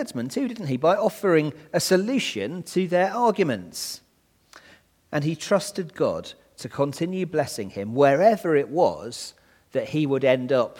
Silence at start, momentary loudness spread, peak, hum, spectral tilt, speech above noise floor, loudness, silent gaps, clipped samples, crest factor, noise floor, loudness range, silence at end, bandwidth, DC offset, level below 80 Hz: 0 s; 12 LU; -4 dBFS; none; -5 dB/octave; 35 dB; -24 LUFS; none; under 0.1%; 20 dB; -58 dBFS; 5 LU; 0 s; 18.5 kHz; under 0.1%; -66 dBFS